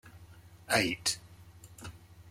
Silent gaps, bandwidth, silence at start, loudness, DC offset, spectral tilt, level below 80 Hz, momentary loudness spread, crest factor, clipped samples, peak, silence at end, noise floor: none; 16.5 kHz; 0.05 s; -31 LUFS; under 0.1%; -2.5 dB/octave; -62 dBFS; 26 LU; 24 dB; under 0.1%; -12 dBFS; 0 s; -54 dBFS